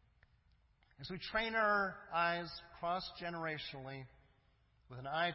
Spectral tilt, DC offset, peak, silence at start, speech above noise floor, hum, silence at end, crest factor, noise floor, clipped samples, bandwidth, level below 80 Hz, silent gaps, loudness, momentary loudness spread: -2 dB/octave; under 0.1%; -22 dBFS; 1 s; 33 dB; none; 0 s; 18 dB; -72 dBFS; under 0.1%; 5.8 kHz; -66 dBFS; none; -39 LUFS; 17 LU